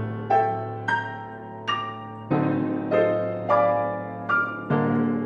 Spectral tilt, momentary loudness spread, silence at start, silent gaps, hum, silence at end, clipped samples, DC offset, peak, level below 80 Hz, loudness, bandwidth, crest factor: -8 dB/octave; 11 LU; 0 s; none; none; 0 s; under 0.1%; under 0.1%; -8 dBFS; -64 dBFS; -25 LUFS; 8.6 kHz; 16 dB